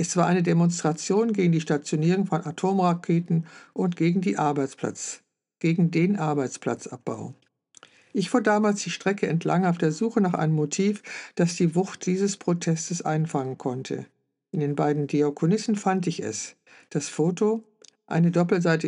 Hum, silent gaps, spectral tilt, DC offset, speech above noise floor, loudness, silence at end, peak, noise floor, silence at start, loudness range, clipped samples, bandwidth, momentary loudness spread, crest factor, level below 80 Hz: none; none; -6 dB/octave; under 0.1%; 31 dB; -25 LUFS; 0 s; -8 dBFS; -55 dBFS; 0 s; 3 LU; under 0.1%; 11 kHz; 10 LU; 18 dB; -78 dBFS